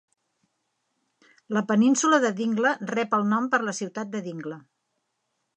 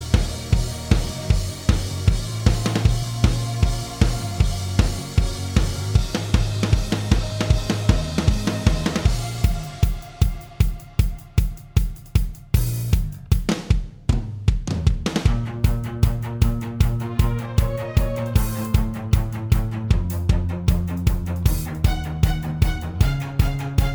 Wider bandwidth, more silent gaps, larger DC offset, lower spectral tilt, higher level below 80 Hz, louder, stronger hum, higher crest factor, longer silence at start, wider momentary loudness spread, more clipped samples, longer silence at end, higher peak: second, 9.6 kHz vs over 20 kHz; neither; neither; second, -4.5 dB/octave vs -6 dB/octave; second, -80 dBFS vs -24 dBFS; about the same, -24 LUFS vs -23 LUFS; neither; about the same, 18 dB vs 20 dB; first, 1.5 s vs 0 s; first, 14 LU vs 3 LU; neither; first, 0.95 s vs 0 s; second, -8 dBFS vs 0 dBFS